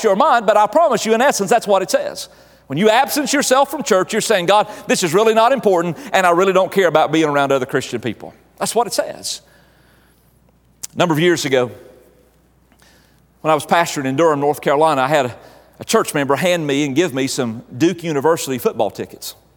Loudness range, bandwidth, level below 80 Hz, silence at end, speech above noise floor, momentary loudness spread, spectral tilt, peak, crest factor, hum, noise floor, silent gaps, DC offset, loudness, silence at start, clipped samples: 7 LU; over 20 kHz; -58 dBFS; 0.25 s; 38 dB; 12 LU; -4 dB/octave; 0 dBFS; 16 dB; none; -54 dBFS; none; under 0.1%; -16 LUFS; 0 s; under 0.1%